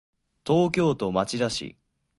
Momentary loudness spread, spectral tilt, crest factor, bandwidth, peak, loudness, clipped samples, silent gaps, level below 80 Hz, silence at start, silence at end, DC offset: 14 LU; -5.5 dB/octave; 18 dB; 11.5 kHz; -8 dBFS; -25 LUFS; under 0.1%; none; -56 dBFS; 0.45 s; 0.5 s; under 0.1%